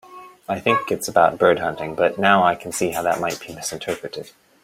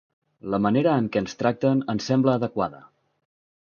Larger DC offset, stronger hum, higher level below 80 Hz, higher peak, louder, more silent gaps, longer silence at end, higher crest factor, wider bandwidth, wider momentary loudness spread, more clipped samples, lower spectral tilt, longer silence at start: neither; neither; about the same, -58 dBFS vs -60 dBFS; first, -2 dBFS vs -6 dBFS; first, -20 LUFS vs -23 LUFS; neither; second, 0.4 s vs 0.85 s; about the same, 20 dB vs 20 dB; first, 16.5 kHz vs 7 kHz; first, 13 LU vs 8 LU; neither; second, -4 dB/octave vs -7 dB/octave; second, 0.1 s vs 0.45 s